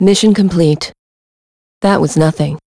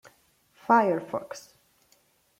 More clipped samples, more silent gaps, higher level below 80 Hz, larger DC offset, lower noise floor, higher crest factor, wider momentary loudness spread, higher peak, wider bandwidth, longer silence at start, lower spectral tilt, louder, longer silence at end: neither; first, 0.98-1.81 s vs none; first, -42 dBFS vs -76 dBFS; neither; first, under -90 dBFS vs -66 dBFS; second, 12 dB vs 22 dB; second, 8 LU vs 22 LU; first, 0 dBFS vs -8 dBFS; second, 11 kHz vs 16 kHz; second, 0 s vs 0.7 s; about the same, -6 dB/octave vs -6 dB/octave; first, -12 LUFS vs -25 LUFS; second, 0.1 s vs 1 s